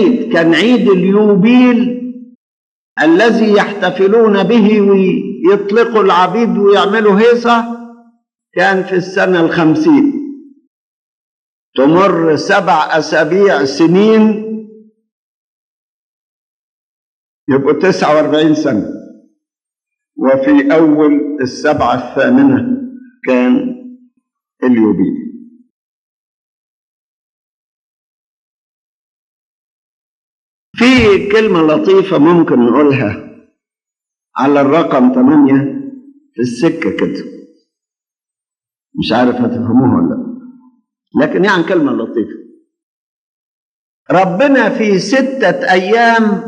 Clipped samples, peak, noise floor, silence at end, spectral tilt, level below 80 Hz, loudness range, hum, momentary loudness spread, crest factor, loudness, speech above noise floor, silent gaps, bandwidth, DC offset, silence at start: under 0.1%; 0 dBFS; under -90 dBFS; 0 s; -6.5 dB/octave; -50 dBFS; 7 LU; none; 14 LU; 12 dB; -10 LUFS; over 80 dB; 2.35-2.96 s, 10.67-11.73 s, 15.12-17.47 s, 25.70-30.74 s, 42.83-44.06 s; 9.2 kHz; under 0.1%; 0 s